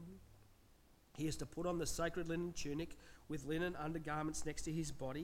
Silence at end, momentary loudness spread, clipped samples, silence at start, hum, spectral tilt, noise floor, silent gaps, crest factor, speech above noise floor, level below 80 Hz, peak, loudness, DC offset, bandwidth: 0 s; 10 LU; under 0.1%; 0 s; none; -5 dB/octave; -68 dBFS; none; 18 dB; 26 dB; -56 dBFS; -26 dBFS; -43 LUFS; under 0.1%; 16.5 kHz